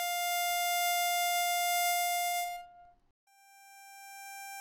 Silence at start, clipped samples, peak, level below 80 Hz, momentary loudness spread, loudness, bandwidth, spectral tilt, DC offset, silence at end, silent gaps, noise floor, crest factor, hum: 0 s; under 0.1%; -18 dBFS; -76 dBFS; 18 LU; -30 LUFS; over 20 kHz; 4 dB/octave; under 0.1%; 0 s; 3.11-3.27 s; -58 dBFS; 16 dB; none